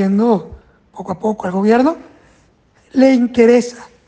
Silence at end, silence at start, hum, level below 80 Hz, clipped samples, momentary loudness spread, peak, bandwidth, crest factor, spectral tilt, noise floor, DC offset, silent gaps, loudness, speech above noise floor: 0.25 s; 0 s; none; -50 dBFS; under 0.1%; 16 LU; 0 dBFS; 9 kHz; 14 dB; -7 dB/octave; -53 dBFS; under 0.1%; none; -14 LUFS; 40 dB